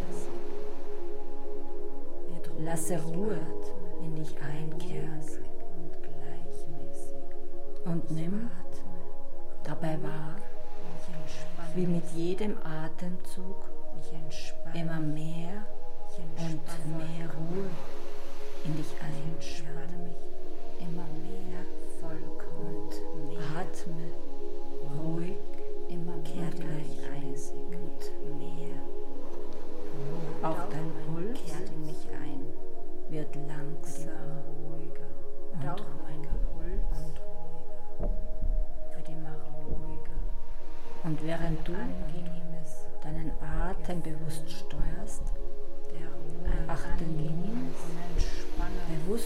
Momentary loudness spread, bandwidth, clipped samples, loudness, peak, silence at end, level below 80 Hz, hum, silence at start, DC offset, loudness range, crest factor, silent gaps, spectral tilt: 11 LU; 10 kHz; under 0.1%; -39 LUFS; -12 dBFS; 0 s; -34 dBFS; none; 0 s; under 0.1%; 5 LU; 12 dB; none; -6.5 dB/octave